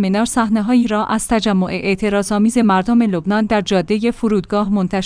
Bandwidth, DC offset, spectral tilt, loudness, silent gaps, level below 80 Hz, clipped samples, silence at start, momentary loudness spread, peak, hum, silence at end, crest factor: 10.5 kHz; under 0.1%; -5.5 dB/octave; -16 LUFS; none; -40 dBFS; under 0.1%; 0 s; 4 LU; -2 dBFS; none; 0 s; 12 dB